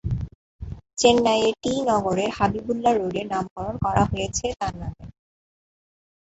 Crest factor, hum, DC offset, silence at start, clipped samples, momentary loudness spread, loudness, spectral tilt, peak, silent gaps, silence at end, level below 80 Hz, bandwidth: 20 dB; none; under 0.1%; 0.05 s; under 0.1%; 17 LU; -23 LUFS; -5 dB/octave; -4 dBFS; 0.35-0.59 s, 3.50-3.56 s; 1.1 s; -42 dBFS; 8.2 kHz